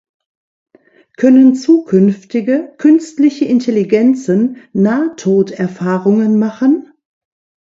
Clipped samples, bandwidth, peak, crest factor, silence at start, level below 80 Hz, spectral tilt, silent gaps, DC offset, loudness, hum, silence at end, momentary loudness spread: under 0.1%; 7.8 kHz; 0 dBFS; 12 dB; 1.2 s; -60 dBFS; -7.5 dB/octave; none; under 0.1%; -12 LUFS; none; 0.85 s; 8 LU